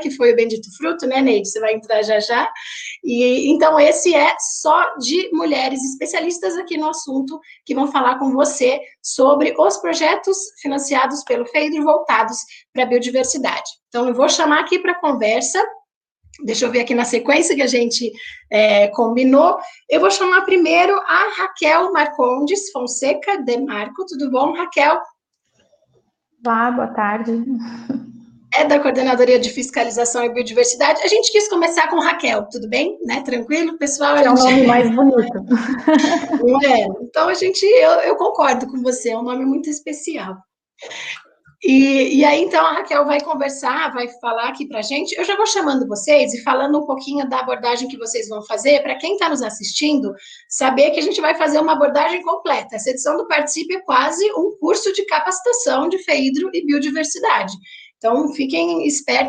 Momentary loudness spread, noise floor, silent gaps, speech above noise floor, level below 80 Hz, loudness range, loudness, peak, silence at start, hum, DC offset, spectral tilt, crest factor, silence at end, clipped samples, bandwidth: 10 LU; -65 dBFS; 12.69-12.73 s, 15.96-16.01 s; 48 dB; -64 dBFS; 5 LU; -17 LUFS; 0 dBFS; 0 s; none; under 0.1%; -2.5 dB/octave; 16 dB; 0 s; under 0.1%; 10 kHz